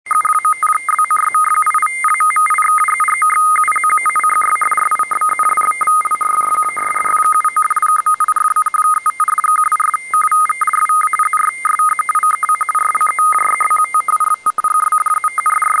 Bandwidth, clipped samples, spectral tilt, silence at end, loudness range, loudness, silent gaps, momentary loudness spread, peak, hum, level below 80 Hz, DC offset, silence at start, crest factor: 10.5 kHz; under 0.1%; 1 dB/octave; 0 s; 1 LU; -13 LUFS; none; 3 LU; -4 dBFS; none; -66 dBFS; under 0.1%; 0.05 s; 10 dB